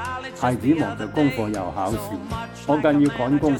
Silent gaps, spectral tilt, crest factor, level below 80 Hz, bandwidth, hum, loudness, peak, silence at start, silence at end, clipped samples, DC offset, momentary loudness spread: none; -6.5 dB/octave; 16 dB; -46 dBFS; 19 kHz; none; -23 LUFS; -6 dBFS; 0 s; 0 s; under 0.1%; under 0.1%; 11 LU